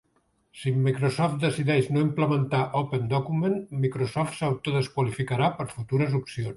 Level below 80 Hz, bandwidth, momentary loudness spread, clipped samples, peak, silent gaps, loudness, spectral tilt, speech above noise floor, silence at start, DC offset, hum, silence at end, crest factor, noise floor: -60 dBFS; 11.5 kHz; 4 LU; under 0.1%; -10 dBFS; none; -26 LUFS; -7 dB/octave; 44 dB; 0.55 s; under 0.1%; none; 0 s; 16 dB; -69 dBFS